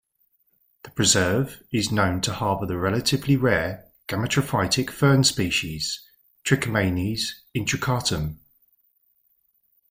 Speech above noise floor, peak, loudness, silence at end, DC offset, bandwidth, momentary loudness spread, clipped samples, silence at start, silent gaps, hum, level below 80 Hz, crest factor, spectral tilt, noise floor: 45 dB; -4 dBFS; -23 LUFS; 1.55 s; under 0.1%; 16.5 kHz; 10 LU; under 0.1%; 0.85 s; none; none; -50 dBFS; 22 dB; -4 dB/octave; -68 dBFS